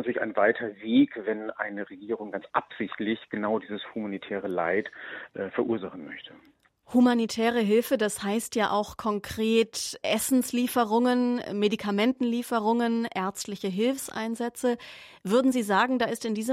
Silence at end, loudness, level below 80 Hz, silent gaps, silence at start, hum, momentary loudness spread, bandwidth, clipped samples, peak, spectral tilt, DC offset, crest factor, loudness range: 0 s; -27 LUFS; -66 dBFS; none; 0 s; none; 11 LU; 16 kHz; under 0.1%; -8 dBFS; -4.5 dB/octave; under 0.1%; 18 dB; 6 LU